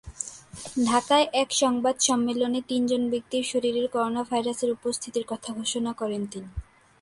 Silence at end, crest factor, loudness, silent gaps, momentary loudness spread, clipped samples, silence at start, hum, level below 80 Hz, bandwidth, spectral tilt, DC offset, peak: 0.4 s; 18 dB; -26 LUFS; none; 13 LU; under 0.1%; 0.05 s; none; -52 dBFS; 11.5 kHz; -3 dB/octave; under 0.1%; -8 dBFS